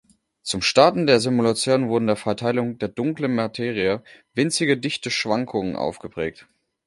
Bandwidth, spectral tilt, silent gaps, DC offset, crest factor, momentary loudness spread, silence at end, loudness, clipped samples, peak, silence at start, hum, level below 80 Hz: 11.5 kHz; -4.5 dB/octave; none; under 0.1%; 22 dB; 13 LU; 0.45 s; -22 LUFS; under 0.1%; 0 dBFS; 0.45 s; none; -56 dBFS